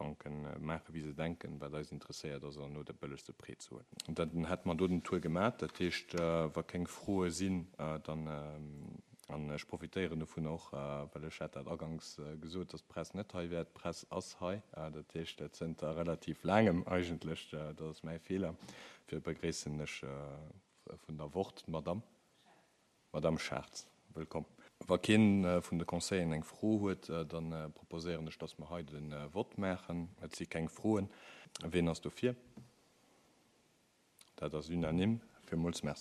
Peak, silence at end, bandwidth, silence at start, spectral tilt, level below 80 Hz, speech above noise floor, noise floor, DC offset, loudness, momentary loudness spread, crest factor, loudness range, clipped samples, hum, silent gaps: -16 dBFS; 0 s; 13 kHz; 0 s; -6 dB/octave; -62 dBFS; 34 dB; -73 dBFS; under 0.1%; -40 LUFS; 13 LU; 24 dB; 9 LU; under 0.1%; none; none